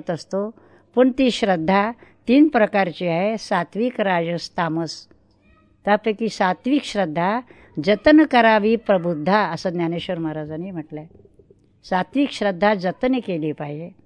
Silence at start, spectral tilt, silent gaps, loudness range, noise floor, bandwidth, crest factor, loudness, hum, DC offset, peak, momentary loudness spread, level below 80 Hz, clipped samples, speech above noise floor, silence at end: 0.05 s; -6 dB/octave; none; 6 LU; -56 dBFS; 10 kHz; 20 dB; -20 LUFS; none; under 0.1%; -2 dBFS; 15 LU; -54 dBFS; under 0.1%; 36 dB; 0.15 s